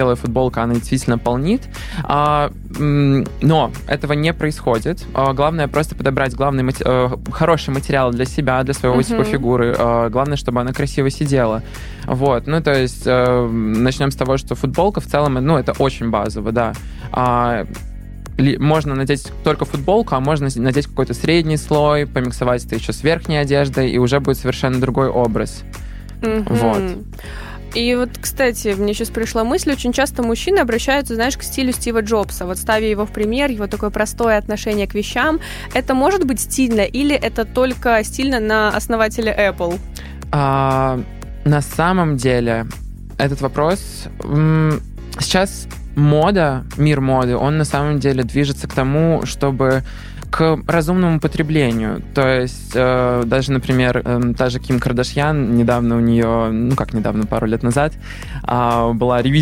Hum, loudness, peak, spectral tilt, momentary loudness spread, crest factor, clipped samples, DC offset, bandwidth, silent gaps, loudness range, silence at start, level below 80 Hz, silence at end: none; -17 LUFS; -2 dBFS; -6 dB/octave; 7 LU; 16 dB; under 0.1%; under 0.1%; 16.5 kHz; none; 2 LU; 0 s; -32 dBFS; 0 s